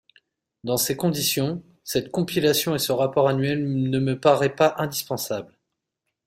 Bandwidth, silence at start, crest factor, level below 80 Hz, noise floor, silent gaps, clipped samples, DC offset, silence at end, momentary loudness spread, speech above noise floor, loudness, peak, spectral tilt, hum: 16 kHz; 0.65 s; 20 dB; -60 dBFS; -81 dBFS; none; under 0.1%; under 0.1%; 0.8 s; 8 LU; 59 dB; -23 LUFS; -4 dBFS; -4.5 dB/octave; none